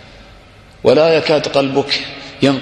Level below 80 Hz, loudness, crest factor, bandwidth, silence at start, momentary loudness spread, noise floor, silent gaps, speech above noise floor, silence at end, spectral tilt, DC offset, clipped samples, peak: -48 dBFS; -14 LUFS; 16 dB; 11 kHz; 0.85 s; 7 LU; -41 dBFS; none; 28 dB; 0 s; -5.5 dB/octave; under 0.1%; under 0.1%; 0 dBFS